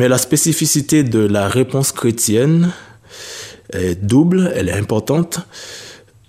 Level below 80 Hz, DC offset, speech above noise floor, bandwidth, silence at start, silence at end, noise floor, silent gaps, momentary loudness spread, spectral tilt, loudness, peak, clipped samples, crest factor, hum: -48 dBFS; under 0.1%; 20 dB; 15.5 kHz; 0 s; 0.35 s; -35 dBFS; none; 18 LU; -5 dB/octave; -15 LUFS; -2 dBFS; under 0.1%; 14 dB; none